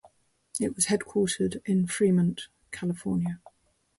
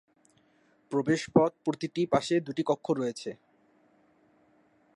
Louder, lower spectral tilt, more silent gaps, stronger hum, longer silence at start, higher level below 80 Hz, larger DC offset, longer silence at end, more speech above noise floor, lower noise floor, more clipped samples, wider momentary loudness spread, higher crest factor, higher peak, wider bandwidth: about the same, -28 LUFS vs -29 LUFS; about the same, -5 dB/octave vs -6 dB/octave; neither; neither; second, 0.55 s vs 0.9 s; first, -60 dBFS vs -70 dBFS; neither; second, 0.6 s vs 1.6 s; second, 34 dB vs 38 dB; second, -61 dBFS vs -66 dBFS; neither; first, 13 LU vs 9 LU; second, 18 dB vs 24 dB; second, -12 dBFS vs -8 dBFS; about the same, 11.5 kHz vs 11 kHz